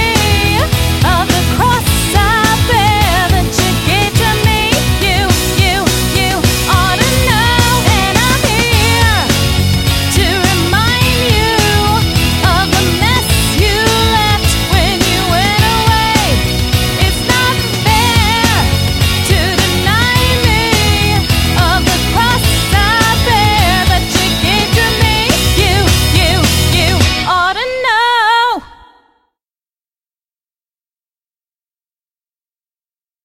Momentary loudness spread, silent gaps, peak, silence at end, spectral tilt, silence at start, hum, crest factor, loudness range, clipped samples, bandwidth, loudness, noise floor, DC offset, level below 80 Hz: 2 LU; none; 0 dBFS; 4.6 s; -4 dB/octave; 0 s; none; 12 dB; 1 LU; under 0.1%; 16.5 kHz; -10 LUFS; under -90 dBFS; under 0.1%; -20 dBFS